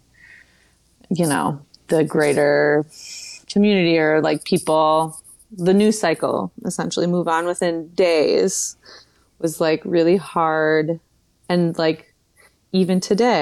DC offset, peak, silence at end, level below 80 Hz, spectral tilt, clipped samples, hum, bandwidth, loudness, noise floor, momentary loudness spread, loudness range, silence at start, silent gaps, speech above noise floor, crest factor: under 0.1%; -6 dBFS; 0 s; -62 dBFS; -5 dB/octave; under 0.1%; none; 13 kHz; -19 LUFS; -58 dBFS; 11 LU; 3 LU; 1.1 s; none; 39 dB; 14 dB